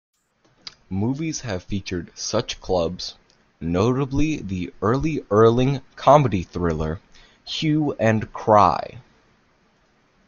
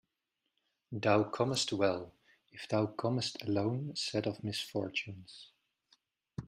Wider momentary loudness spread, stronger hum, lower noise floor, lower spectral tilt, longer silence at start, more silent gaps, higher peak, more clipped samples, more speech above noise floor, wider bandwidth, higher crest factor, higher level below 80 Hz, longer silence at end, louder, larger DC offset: second, 16 LU vs 19 LU; neither; second, -62 dBFS vs -86 dBFS; about the same, -6 dB/octave vs -5 dB/octave; about the same, 0.9 s vs 0.9 s; neither; first, -2 dBFS vs -16 dBFS; neither; second, 41 dB vs 52 dB; second, 7.2 kHz vs 15.5 kHz; about the same, 20 dB vs 20 dB; first, -42 dBFS vs -72 dBFS; first, 1.25 s vs 0 s; first, -21 LUFS vs -34 LUFS; neither